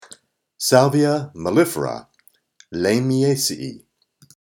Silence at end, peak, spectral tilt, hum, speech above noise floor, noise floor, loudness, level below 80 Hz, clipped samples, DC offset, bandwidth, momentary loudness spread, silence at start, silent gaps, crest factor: 0.7 s; 0 dBFS; -5 dB/octave; none; 40 dB; -58 dBFS; -19 LUFS; -60 dBFS; under 0.1%; under 0.1%; over 20 kHz; 16 LU; 0.6 s; none; 20 dB